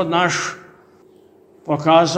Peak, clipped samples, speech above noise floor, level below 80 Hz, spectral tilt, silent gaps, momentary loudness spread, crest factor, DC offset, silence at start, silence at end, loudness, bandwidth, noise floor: -2 dBFS; under 0.1%; 33 dB; -62 dBFS; -4.5 dB/octave; none; 22 LU; 18 dB; under 0.1%; 0 s; 0 s; -18 LUFS; 9.8 kHz; -50 dBFS